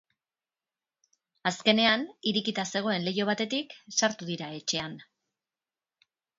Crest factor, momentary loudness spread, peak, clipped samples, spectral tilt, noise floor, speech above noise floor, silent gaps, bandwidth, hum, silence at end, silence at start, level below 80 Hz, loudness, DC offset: 24 dB; 11 LU; -6 dBFS; under 0.1%; -3 dB/octave; under -90 dBFS; over 61 dB; none; 7.8 kHz; none; 1.35 s; 1.45 s; -72 dBFS; -28 LUFS; under 0.1%